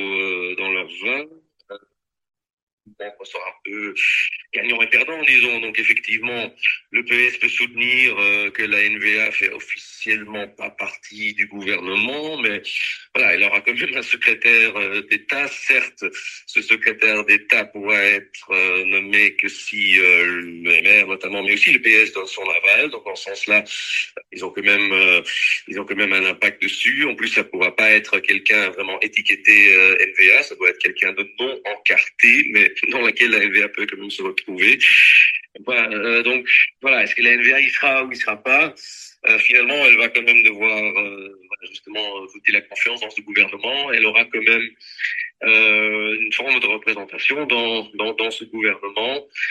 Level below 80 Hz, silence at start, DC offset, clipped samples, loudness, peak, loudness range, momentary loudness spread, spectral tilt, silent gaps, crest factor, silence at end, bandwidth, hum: -70 dBFS; 0 s; under 0.1%; under 0.1%; -15 LUFS; 0 dBFS; 7 LU; 14 LU; -2 dB/octave; 2.53-2.67 s, 2.73-2.78 s; 18 dB; 0 s; 12.5 kHz; none